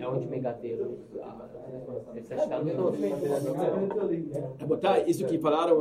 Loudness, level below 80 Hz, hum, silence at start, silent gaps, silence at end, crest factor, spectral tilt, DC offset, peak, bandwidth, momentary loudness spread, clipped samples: -29 LUFS; -66 dBFS; none; 0 s; none; 0 s; 18 dB; -7 dB/octave; under 0.1%; -10 dBFS; 15.5 kHz; 16 LU; under 0.1%